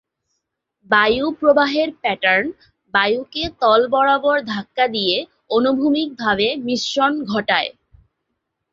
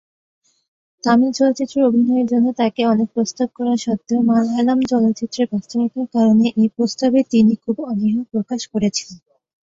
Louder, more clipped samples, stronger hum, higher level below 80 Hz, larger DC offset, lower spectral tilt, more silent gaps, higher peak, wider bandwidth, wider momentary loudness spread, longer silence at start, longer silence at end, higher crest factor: about the same, -18 LUFS vs -18 LUFS; neither; neither; first, -54 dBFS vs -60 dBFS; neither; second, -4 dB/octave vs -5.5 dB/octave; neither; about the same, 0 dBFS vs -2 dBFS; about the same, 7.6 kHz vs 7.8 kHz; about the same, 7 LU vs 7 LU; second, 0.9 s vs 1.05 s; first, 1 s vs 0.55 s; about the same, 18 dB vs 16 dB